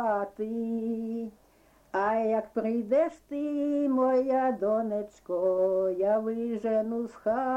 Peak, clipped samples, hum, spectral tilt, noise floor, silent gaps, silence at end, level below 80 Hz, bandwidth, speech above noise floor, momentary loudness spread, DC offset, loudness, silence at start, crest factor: -16 dBFS; under 0.1%; none; -8 dB/octave; -61 dBFS; none; 0 s; -66 dBFS; 9.2 kHz; 33 dB; 8 LU; under 0.1%; -29 LUFS; 0 s; 12 dB